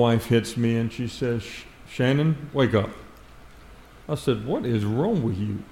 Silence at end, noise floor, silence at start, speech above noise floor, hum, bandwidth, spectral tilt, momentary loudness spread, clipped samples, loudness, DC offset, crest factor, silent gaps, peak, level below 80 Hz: 0.05 s; -47 dBFS; 0 s; 23 dB; none; 16 kHz; -7 dB/octave; 13 LU; under 0.1%; -25 LUFS; under 0.1%; 18 dB; none; -6 dBFS; -50 dBFS